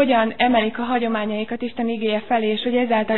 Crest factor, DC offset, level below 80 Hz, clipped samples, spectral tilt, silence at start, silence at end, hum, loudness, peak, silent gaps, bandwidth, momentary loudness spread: 16 dB; 1%; -56 dBFS; under 0.1%; -8.5 dB/octave; 0 s; 0 s; none; -21 LUFS; -4 dBFS; none; 4.2 kHz; 7 LU